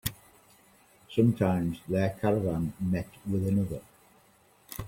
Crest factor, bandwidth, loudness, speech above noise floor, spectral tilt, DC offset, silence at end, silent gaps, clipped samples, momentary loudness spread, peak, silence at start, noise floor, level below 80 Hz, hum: 20 dB; 16.5 kHz; -29 LUFS; 34 dB; -7.5 dB/octave; under 0.1%; 0 s; none; under 0.1%; 10 LU; -10 dBFS; 0.05 s; -62 dBFS; -54 dBFS; none